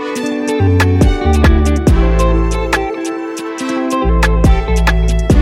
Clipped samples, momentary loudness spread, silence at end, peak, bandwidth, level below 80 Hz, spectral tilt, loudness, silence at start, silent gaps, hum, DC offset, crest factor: under 0.1%; 8 LU; 0 s; 0 dBFS; 14.5 kHz; -14 dBFS; -6.5 dB/octave; -14 LUFS; 0 s; none; none; under 0.1%; 12 dB